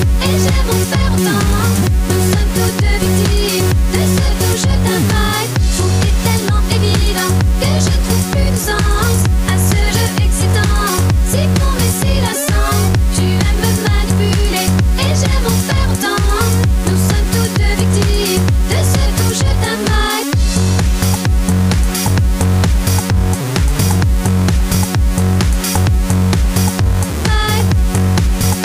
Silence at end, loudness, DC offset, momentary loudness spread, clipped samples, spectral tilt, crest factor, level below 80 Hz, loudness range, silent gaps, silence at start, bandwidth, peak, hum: 0 s; -14 LUFS; under 0.1%; 1 LU; under 0.1%; -5 dB/octave; 10 dB; -18 dBFS; 1 LU; none; 0 s; 16 kHz; -2 dBFS; none